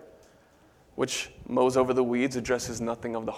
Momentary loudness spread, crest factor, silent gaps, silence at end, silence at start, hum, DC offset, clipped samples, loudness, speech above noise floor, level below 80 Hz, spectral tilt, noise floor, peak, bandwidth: 9 LU; 18 dB; none; 0 s; 0 s; none; under 0.1%; under 0.1%; -28 LUFS; 32 dB; -56 dBFS; -4.5 dB/octave; -59 dBFS; -10 dBFS; 15.5 kHz